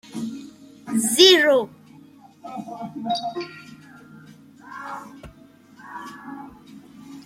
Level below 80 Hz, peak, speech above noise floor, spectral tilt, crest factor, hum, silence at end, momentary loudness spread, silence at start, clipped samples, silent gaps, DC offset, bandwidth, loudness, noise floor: -64 dBFS; -2 dBFS; 29 dB; -2 dB/octave; 24 dB; none; 0.05 s; 29 LU; 0.1 s; under 0.1%; none; under 0.1%; 16.5 kHz; -19 LUFS; -50 dBFS